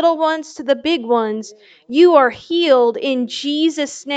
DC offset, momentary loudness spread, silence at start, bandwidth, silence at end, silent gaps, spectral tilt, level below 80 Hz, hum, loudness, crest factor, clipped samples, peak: under 0.1%; 12 LU; 0 s; 9 kHz; 0 s; none; -3.5 dB/octave; -66 dBFS; none; -16 LUFS; 16 dB; under 0.1%; 0 dBFS